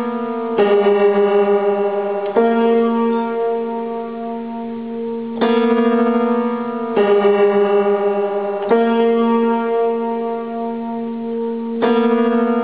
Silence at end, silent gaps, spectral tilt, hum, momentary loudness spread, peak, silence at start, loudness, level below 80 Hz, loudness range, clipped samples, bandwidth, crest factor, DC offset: 0 s; none; -11 dB/octave; none; 10 LU; -2 dBFS; 0 s; -17 LUFS; -64 dBFS; 3 LU; under 0.1%; 4.8 kHz; 14 dB; 0.4%